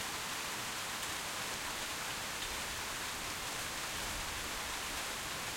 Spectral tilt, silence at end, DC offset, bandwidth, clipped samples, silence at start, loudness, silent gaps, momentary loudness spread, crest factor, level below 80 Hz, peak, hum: -1 dB/octave; 0 s; under 0.1%; 16.5 kHz; under 0.1%; 0 s; -38 LUFS; none; 1 LU; 16 dB; -56 dBFS; -24 dBFS; none